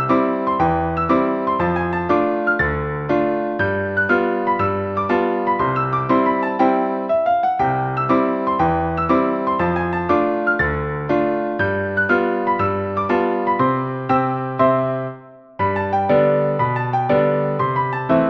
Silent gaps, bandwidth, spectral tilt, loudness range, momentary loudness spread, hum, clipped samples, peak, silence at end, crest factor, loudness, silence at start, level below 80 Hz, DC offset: none; 6.2 kHz; -9 dB/octave; 1 LU; 4 LU; none; under 0.1%; -4 dBFS; 0 s; 16 dB; -19 LUFS; 0 s; -42 dBFS; under 0.1%